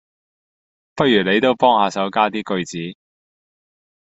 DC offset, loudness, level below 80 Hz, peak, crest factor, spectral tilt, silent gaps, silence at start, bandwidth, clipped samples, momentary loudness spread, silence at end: under 0.1%; -17 LUFS; -60 dBFS; -2 dBFS; 18 dB; -5 dB/octave; none; 0.95 s; 8.2 kHz; under 0.1%; 14 LU; 1.2 s